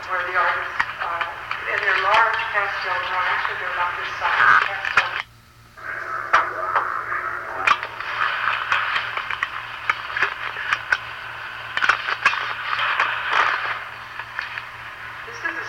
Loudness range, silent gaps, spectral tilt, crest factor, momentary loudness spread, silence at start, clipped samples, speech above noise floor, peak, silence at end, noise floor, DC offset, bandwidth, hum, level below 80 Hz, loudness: 4 LU; none; -2 dB/octave; 20 dB; 13 LU; 0 s; under 0.1%; 27 dB; -4 dBFS; 0 s; -48 dBFS; under 0.1%; 16.5 kHz; none; -56 dBFS; -22 LUFS